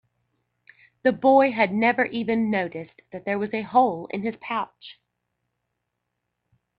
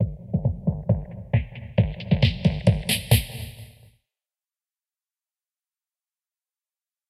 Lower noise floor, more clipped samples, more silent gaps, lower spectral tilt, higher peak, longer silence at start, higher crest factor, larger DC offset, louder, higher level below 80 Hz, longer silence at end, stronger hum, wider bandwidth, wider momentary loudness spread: second, -80 dBFS vs under -90 dBFS; neither; neither; first, -8.5 dB/octave vs -5.5 dB/octave; about the same, -6 dBFS vs -4 dBFS; first, 1.05 s vs 0 s; about the same, 20 dB vs 22 dB; neither; about the same, -23 LUFS vs -24 LUFS; second, -66 dBFS vs -38 dBFS; second, 1.85 s vs 3.4 s; first, 60 Hz at -55 dBFS vs none; second, 5.2 kHz vs 15.5 kHz; first, 14 LU vs 7 LU